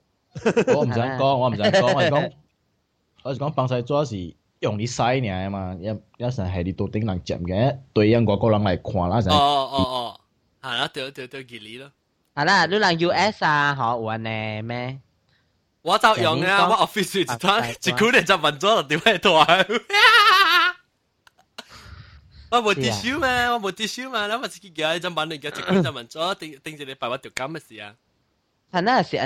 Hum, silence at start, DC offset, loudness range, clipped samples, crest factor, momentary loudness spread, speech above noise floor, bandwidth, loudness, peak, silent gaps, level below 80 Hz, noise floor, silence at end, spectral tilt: none; 0.35 s; under 0.1%; 9 LU; under 0.1%; 22 dB; 16 LU; 49 dB; 16 kHz; -20 LUFS; 0 dBFS; none; -52 dBFS; -70 dBFS; 0 s; -4.5 dB/octave